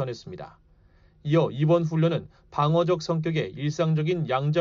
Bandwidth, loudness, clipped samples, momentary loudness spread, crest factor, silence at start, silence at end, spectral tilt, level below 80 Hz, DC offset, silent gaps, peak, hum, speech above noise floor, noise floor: 7.2 kHz; -25 LUFS; under 0.1%; 15 LU; 14 dB; 0 s; 0 s; -7 dB/octave; -58 dBFS; under 0.1%; none; -10 dBFS; none; 33 dB; -57 dBFS